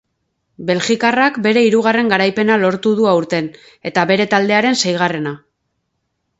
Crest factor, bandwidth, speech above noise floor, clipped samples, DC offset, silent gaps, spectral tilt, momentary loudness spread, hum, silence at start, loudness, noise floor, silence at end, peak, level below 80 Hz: 16 dB; 8 kHz; 56 dB; under 0.1%; under 0.1%; none; -4.5 dB/octave; 10 LU; none; 0.6 s; -15 LUFS; -71 dBFS; 1 s; 0 dBFS; -60 dBFS